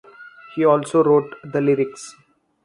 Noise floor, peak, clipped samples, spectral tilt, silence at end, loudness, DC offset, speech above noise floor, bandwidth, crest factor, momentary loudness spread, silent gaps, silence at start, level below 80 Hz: -43 dBFS; -4 dBFS; under 0.1%; -7 dB/octave; 0.55 s; -19 LUFS; under 0.1%; 25 dB; 11.5 kHz; 18 dB; 17 LU; none; 0.2 s; -66 dBFS